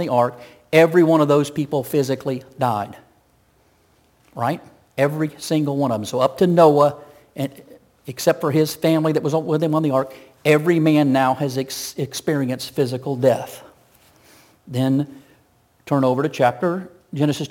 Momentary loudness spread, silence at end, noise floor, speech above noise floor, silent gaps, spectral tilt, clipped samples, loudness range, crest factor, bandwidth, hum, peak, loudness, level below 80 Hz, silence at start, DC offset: 14 LU; 0.05 s; -59 dBFS; 40 dB; none; -6.5 dB/octave; under 0.1%; 6 LU; 18 dB; 17 kHz; none; -2 dBFS; -19 LUFS; -64 dBFS; 0 s; under 0.1%